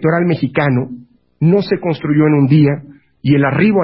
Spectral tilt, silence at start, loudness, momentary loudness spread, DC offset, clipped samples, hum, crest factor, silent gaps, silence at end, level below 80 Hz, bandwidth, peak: -13.5 dB/octave; 0 s; -14 LUFS; 8 LU; under 0.1%; under 0.1%; none; 12 dB; none; 0 s; -50 dBFS; 5.8 kHz; -2 dBFS